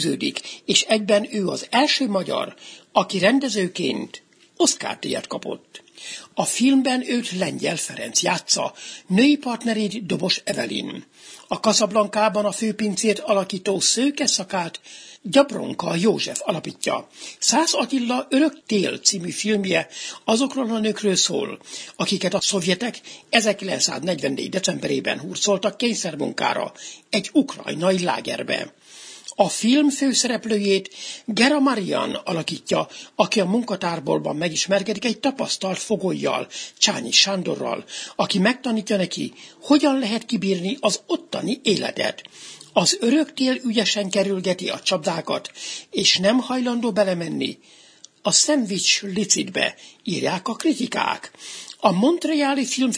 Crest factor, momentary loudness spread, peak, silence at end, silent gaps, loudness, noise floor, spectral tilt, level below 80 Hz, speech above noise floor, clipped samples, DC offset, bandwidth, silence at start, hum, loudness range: 22 dB; 12 LU; 0 dBFS; 0 s; none; -21 LUFS; -43 dBFS; -3 dB/octave; -68 dBFS; 21 dB; under 0.1%; under 0.1%; 11 kHz; 0 s; none; 2 LU